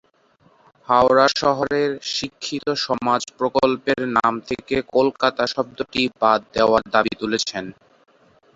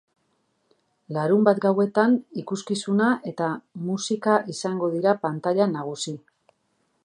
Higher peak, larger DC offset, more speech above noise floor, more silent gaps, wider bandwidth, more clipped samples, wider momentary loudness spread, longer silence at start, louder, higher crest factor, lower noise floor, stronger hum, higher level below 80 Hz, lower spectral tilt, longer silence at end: about the same, -2 dBFS vs -4 dBFS; neither; second, 38 dB vs 48 dB; neither; second, 8 kHz vs 11 kHz; neither; second, 9 LU vs 12 LU; second, 0.9 s vs 1.1 s; first, -20 LUFS vs -24 LUFS; about the same, 20 dB vs 20 dB; second, -58 dBFS vs -71 dBFS; neither; first, -54 dBFS vs -76 dBFS; second, -4 dB/octave vs -5.5 dB/octave; about the same, 0.85 s vs 0.85 s